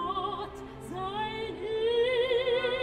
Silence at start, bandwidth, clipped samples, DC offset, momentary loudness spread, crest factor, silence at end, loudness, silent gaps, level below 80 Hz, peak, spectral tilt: 0 s; 11.5 kHz; under 0.1%; under 0.1%; 13 LU; 14 dB; 0 s; -30 LUFS; none; -54 dBFS; -16 dBFS; -5 dB/octave